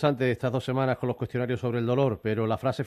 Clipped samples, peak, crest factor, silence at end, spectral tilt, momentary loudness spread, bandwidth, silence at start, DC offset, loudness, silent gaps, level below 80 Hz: under 0.1%; -10 dBFS; 16 dB; 0 s; -8 dB/octave; 4 LU; 13.5 kHz; 0 s; under 0.1%; -27 LUFS; none; -58 dBFS